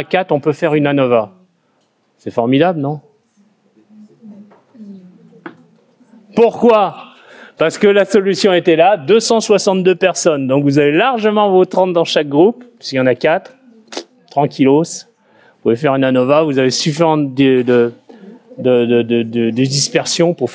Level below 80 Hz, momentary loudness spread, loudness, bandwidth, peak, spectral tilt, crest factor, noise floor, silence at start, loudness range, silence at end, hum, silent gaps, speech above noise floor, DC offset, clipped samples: -60 dBFS; 10 LU; -13 LUFS; 8 kHz; 0 dBFS; -5 dB/octave; 14 dB; -60 dBFS; 0 s; 9 LU; 0 s; none; none; 47 dB; under 0.1%; under 0.1%